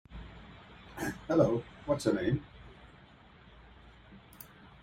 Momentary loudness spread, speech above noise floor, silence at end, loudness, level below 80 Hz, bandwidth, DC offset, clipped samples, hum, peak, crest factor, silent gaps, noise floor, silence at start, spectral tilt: 26 LU; 27 dB; 0.15 s; -32 LUFS; -56 dBFS; 16 kHz; under 0.1%; under 0.1%; none; -14 dBFS; 22 dB; none; -57 dBFS; 0.1 s; -6.5 dB/octave